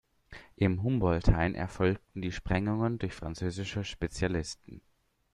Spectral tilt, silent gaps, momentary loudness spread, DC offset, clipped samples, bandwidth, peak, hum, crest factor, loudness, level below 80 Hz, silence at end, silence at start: -6.5 dB/octave; none; 12 LU; under 0.1%; under 0.1%; 11 kHz; -10 dBFS; none; 22 dB; -32 LUFS; -40 dBFS; 0.55 s; 0.3 s